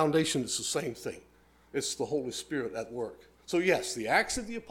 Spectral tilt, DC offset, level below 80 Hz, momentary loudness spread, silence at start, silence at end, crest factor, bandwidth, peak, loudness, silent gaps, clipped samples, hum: -3.5 dB/octave; under 0.1%; -60 dBFS; 13 LU; 0 s; 0 s; 20 dB; 17 kHz; -12 dBFS; -32 LUFS; none; under 0.1%; none